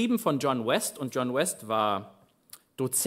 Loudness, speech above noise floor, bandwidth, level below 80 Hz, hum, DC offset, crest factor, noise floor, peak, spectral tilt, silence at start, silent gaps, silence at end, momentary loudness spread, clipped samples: -28 LUFS; 27 dB; 16 kHz; -76 dBFS; none; under 0.1%; 18 dB; -55 dBFS; -12 dBFS; -4 dB/octave; 0 s; none; 0 s; 7 LU; under 0.1%